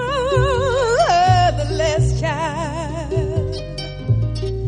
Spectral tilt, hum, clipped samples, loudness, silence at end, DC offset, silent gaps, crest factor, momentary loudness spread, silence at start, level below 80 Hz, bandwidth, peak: -5.5 dB/octave; none; under 0.1%; -19 LUFS; 0 s; under 0.1%; none; 16 dB; 11 LU; 0 s; -30 dBFS; 11 kHz; -2 dBFS